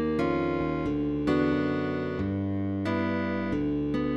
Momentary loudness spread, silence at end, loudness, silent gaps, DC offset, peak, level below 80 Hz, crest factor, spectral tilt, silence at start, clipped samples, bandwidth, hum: 4 LU; 0 s; -28 LUFS; none; 0.2%; -14 dBFS; -48 dBFS; 14 dB; -8.5 dB/octave; 0 s; under 0.1%; 7.8 kHz; none